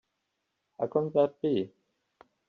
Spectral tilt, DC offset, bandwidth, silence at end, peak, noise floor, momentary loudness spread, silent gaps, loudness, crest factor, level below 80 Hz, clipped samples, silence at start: -7 dB/octave; under 0.1%; 4.7 kHz; 0.8 s; -12 dBFS; -81 dBFS; 9 LU; none; -29 LUFS; 20 dB; -76 dBFS; under 0.1%; 0.8 s